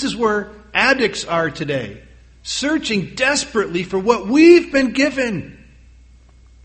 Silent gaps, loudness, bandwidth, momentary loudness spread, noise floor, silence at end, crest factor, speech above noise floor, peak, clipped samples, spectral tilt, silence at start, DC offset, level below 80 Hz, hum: none; -17 LUFS; 8.8 kHz; 13 LU; -46 dBFS; 1.1 s; 18 dB; 30 dB; 0 dBFS; under 0.1%; -4 dB/octave; 0 s; under 0.1%; -46 dBFS; none